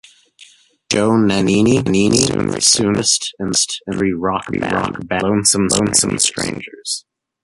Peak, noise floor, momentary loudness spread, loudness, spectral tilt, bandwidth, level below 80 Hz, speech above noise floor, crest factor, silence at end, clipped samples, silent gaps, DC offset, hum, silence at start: 0 dBFS; -47 dBFS; 9 LU; -15 LUFS; -3.5 dB/octave; 12 kHz; -44 dBFS; 31 dB; 16 dB; 0.45 s; under 0.1%; none; under 0.1%; none; 0.4 s